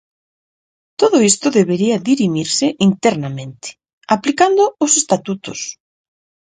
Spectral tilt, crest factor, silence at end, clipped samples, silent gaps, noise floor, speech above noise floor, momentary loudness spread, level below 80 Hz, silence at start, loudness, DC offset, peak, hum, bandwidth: -4 dB/octave; 16 dB; 0.85 s; under 0.1%; 3.93-4.01 s; under -90 dBFS; over 75 dB; 15 LU; -58 dBFS; 1 s; -15 LUFS; under 0.1%; 0 dBFS; none; 9.6 kHz